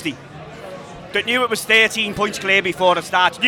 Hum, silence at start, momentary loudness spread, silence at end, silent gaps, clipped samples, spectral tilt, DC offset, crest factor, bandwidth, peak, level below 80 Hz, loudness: none; 0 s; 22 LU; 0 s; none; under 0.1%; -2.5 dB/octave; under 0.1%; 18 dB; 19.5 kHz; -2 dBFS; -52 dBFS; -17 LUFS